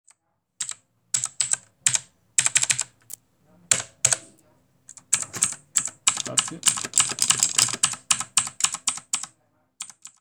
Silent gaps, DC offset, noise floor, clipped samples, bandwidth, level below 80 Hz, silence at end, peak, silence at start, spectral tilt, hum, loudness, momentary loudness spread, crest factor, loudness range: none; under 0.1%; -66 dBFS; under 0.1%; over 20 kHz; -66 dBFS; 0.15 s; -2 dBFS; 0.6 s; 1 dB/octave; none; -22 LUFS; 17 LU; 24 dB; 3 LU